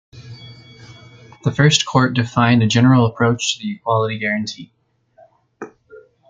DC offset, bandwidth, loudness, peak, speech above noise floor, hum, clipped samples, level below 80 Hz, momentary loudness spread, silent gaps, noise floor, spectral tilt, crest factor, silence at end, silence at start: under 0.1%; 9.2 kHz; -16 LUFS; -2 dBFS; 37 dB; none; under 0.1%; -54 dBFS; 24 LU; none; -53 dBFS; -5 dB/octave; 18 dB; 0.3 s; 0.15 s